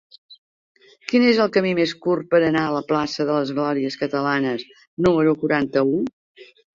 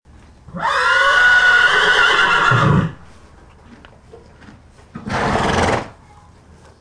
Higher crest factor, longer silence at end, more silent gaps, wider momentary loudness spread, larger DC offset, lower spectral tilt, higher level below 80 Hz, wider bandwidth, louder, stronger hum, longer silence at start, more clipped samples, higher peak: about the same, 16 dB vs 14 dB; second, 0.3 s vs 0.9 s; first, 0.38-0.75 s, 4.87-4.97 s, 6.13-6.35 s vs none; second, 7 LU vs 15 LU; neither; first, -6.5 dB/octave vs -4 dB/octave; second, -56 dBFS vs -40 dBFS; second, 7.6 kHz vs 10.5 kHz; second, -20 LUFS vs -13 LUFS; neither; second, 0.3 s vs 0.5 s; neither; about the same, -4 dBFS vs -2 dBFS